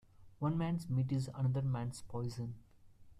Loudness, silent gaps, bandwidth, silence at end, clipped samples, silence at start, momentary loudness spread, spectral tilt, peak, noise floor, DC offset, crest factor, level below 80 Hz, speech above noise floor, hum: -38 LUFS; none; 11.5 kHz; 0 s; under 0.1%; 0.2 s; 9 LU; -8 dB/octave; -22 dBFS; -59 dBFS; under 0.1%; 16 dB; -62 dBFS; 23 dB; none